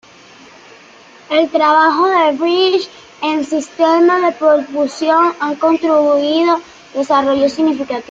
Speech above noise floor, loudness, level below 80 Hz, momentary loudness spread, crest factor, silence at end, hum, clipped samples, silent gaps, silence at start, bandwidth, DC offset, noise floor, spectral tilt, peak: 28 dB; -14 LUFS; -60 dBFS; 9 LU; 12 dB; 0.1 s; none; under 0.1%; none; 1.3 s; 7.8 kHz; under 0.1%; -41 dBFS; -3.5 dB/octave; -2 dBFS